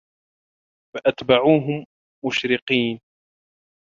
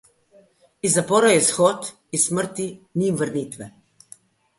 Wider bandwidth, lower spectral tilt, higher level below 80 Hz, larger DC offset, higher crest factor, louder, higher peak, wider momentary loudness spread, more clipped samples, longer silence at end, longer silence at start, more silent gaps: second, 7.4 kHz vs 12 kHz; first, -6 dB/octave vs -3.5 dB/octave; about the same, -60 dBFS vs -64 dBFS; neither; about the same, 22 dB vs 18 dB; about the same, -21 LUFS vs -20 LUFS; about the same, -2 dBFS vs -4 dBFS; about the same, 14 LU vs 15 LU; neither; about the same, 1 s vs 0.9 s; about the same, 0.95 s vs 0.85 s; first, 1.85-2.22 s, 2.62-2.67 s vs none